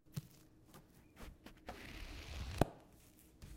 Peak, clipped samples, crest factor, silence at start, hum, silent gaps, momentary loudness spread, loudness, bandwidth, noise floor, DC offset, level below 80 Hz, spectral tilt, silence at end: -10 dBFS; under 0.1%; 36 dB; 0.05 s; none; none; 24 LU; -46 LUFS; 16 kHz; -64 dBFS; under 0.1%; -56 dBFS; -6 dB/octave; 0 s